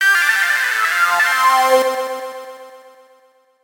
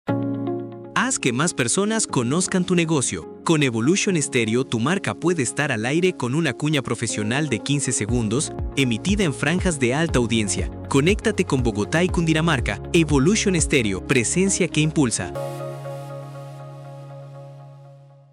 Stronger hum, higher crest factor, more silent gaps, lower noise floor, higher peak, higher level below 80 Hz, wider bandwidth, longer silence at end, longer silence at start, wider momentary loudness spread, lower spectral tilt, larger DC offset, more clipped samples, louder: neither; about the same, 16 dB vs 16 dB; neither; first, -54 dBFS vs -46 dBFS; first, 0 dBFS vs -6 dBFS; second, -80 dBFS vs -38 dBFS; first, 18 kHz vs 15 kHz; first, 0.85 s vs 0.35 s; about the same, 0 s vs 0.05 s; first, 17 LU vs 14 LU; second, 1 dB/octave vs -4.5 dB/octave; neither; neither; first, -14 LUFS vs -21 LUFS